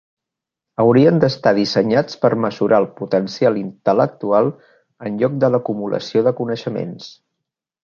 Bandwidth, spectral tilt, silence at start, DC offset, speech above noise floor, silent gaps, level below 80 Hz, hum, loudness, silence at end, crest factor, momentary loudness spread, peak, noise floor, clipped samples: 7.2 kHz; -7 dB/octave; 0.8 s; under 0.1%; 68 dB; none; -60 dBFS; none; -17 LUFS; 0.75 s; 18 dB; 12 LU; 0 dBFS; -85 dBFS; under 0.1%